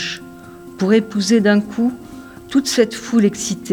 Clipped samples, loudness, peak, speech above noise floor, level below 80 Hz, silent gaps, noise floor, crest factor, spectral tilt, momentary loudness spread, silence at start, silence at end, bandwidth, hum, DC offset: under 0.1%; -17 LUFS; -2 dBFS; 21 dB; -54 dBFS; none; -37 dBFS; 16 dB; -4.5 dB/octave; 22 LU; 0 s; 0 s; 18 kHz; none; under 0.1%